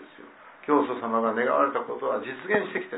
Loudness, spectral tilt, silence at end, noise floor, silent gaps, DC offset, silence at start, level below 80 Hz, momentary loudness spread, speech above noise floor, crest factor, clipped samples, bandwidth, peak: -26 LUFS; -9 dB/octave; 0 s; -49 dBFS; none; under 0.1%; 0 s; -80 dBFS; 6 LU; 23 dB; 18 dB; under 0.1%; 4 kHz; -8 dBFS